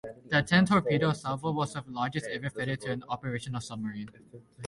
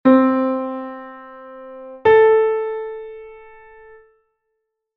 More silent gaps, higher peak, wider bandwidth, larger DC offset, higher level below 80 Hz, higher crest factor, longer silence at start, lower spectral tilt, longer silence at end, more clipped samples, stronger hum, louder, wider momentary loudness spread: neither; second, -12 dBFS vs -2 dBFS; first, 11.5 kHz vs 4.3 kHz; neither; about the same, -60 dBFS vs -58 dBFS; about the same, 20 dB vs 18 dB; about the same, 0.05 s vs 0.05 s; first, -6 dB/octave vs -4.5 dB/octave; second, 0 s vs 1.6 s; neither; neither; second, -30 LUFS vs -17 LUFS; second, 13 LU vs 25 LU